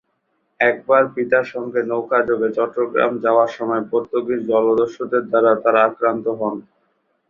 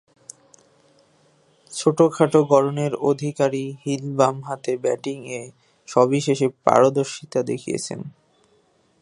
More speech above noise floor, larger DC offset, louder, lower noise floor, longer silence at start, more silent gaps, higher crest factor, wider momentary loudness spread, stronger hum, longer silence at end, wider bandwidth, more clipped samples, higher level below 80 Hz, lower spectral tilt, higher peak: first, 51 dB vs 41 dB; neither; first, -18 LUFS vs -21 LUFS; first, -69 dBFS vs -61 dBFS; second, 0.6 s vs 1.7 s; neither; about the same, 18 dB vs 22 dB; second, 7 LU vs 15 LU; neither; second, 0.7 s vs 0.9 s; second, 7 kHz vs 11.5 kHz; neither; first, -64 dBFS vs -70 dBFS; about the same, -7 dB/octave vs -6 dB/octave; about the same, -2 dBFS vs 0 dBFS